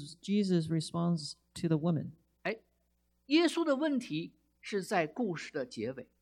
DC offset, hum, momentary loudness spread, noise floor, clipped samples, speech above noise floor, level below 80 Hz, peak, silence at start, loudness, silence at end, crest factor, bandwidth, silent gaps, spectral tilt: under 0.1%; 60 Hz at -60 dBFS; 11 LU; -76 dBFS; under 0.1%; 43 dB; -72 dBFS; -14 dBFS; 0 s; -33 LUFS; 0.2 s; 18 dB; 14 kHz; none; -6 dB/octave